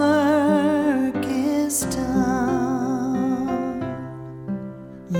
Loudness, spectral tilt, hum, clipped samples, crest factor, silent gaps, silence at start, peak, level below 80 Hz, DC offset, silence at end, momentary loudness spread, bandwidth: -22 LUFS; -5.5 dB/octave; none; under 0.1%; 14 dB; none; 0 s; -8 dBFS; -48 dBFS; under 0.1%; 0 s; 14 LU; 18.5 kHz